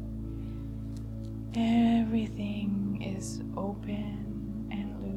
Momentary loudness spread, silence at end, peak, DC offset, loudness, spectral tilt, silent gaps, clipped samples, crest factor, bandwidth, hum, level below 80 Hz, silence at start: 13 LU; 0 s; -14 dBFS; under 0.1%; -33 LUFS; -7 dB/octave; none; under 0.1%; 16 dB; 12 kHz; none; -44 dBFS; 0 s